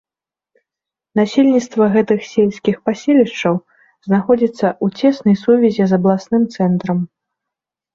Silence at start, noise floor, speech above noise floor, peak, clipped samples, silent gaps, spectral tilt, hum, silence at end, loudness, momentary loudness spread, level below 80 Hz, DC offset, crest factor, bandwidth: 1.15 s; -89 dBFS; 75 dB; -2 dBFS; under 0.1%; none; -7.5 dB/octave; none; 0.9 s; -15 LUFS; 6 LU; -58 dBFS; under 0.1%; 14 dB; 7.4 kHz